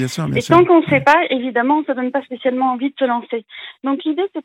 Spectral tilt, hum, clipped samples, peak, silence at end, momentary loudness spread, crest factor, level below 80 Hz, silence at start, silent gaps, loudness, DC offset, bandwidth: -6 dB/octave; none; under 0.1%; 0 dBFS; 0.05 s; 10 LU; 16 dB; -56 dBFS; 0 s; none; -16 LUFS; under 0.1%; 13.5 kHz